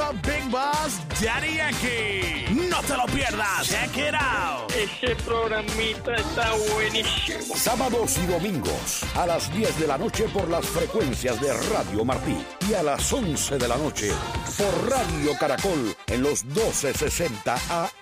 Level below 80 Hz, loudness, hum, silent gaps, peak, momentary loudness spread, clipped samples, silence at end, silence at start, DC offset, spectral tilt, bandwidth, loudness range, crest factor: -40 dBFS; -24 LUFS; none; none; -10 dBFS; 3 LU; under 0.1%; 0 s; 0 s; under 0.1%; -3.5 dB/octave; 16 kHz; 1 LU; 14 dB